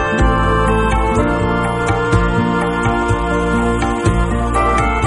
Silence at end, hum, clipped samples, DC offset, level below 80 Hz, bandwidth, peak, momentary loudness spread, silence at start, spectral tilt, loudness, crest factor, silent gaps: 0 s; none; under 0.1%; under 0.1%; -22 dBFS; 10.5 kHz; -2 dBFS; 2 LU; 0 s; -6.5 dB/octave; -15 LUFS; 12 dB; none